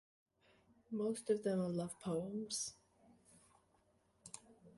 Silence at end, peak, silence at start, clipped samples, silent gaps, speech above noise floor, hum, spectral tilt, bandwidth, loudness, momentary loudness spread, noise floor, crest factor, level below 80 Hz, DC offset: 0.05 s; -26 dBFS; 0.9 s; under 0.1%; none; 36 dB; none; -5 dB/octave; 11.5 kHz; -41 LUFS; 17 LU; -76 dBFS; 20 dB; -78 dBFS; under 0.1%